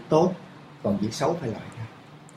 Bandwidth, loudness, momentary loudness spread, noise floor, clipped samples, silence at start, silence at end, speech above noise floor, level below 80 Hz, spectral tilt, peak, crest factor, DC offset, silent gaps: 14.5 kHz; -27 LUFS; 19 LU; -47 dBFS; under 0.1%; 0 s; 0.05 s; 22 dB; -60 dBFS; -6.5 dB/octave; -6 dBFS; 20 dB; under 0.1%; none